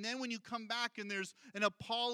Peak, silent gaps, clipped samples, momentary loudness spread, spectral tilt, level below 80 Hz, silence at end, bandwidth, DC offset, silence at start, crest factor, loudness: -20 dBFS; none; under 0.1%; 5 LU; -2.5 dB/octave; -80 dBFS; 0 s; 16 kHz; under 0.1%; 0 s; 20 dB; -39 LUFS